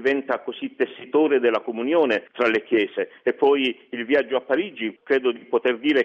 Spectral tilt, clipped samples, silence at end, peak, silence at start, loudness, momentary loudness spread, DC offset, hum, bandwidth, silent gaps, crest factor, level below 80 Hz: -5.5 dB/octave; under 0.1%; 0 s; -8 dBFS; 0 s; -22 LUFS; 8 LU; under 0.1%; none; 7 kHz; none; 14 dB; -70 dBFS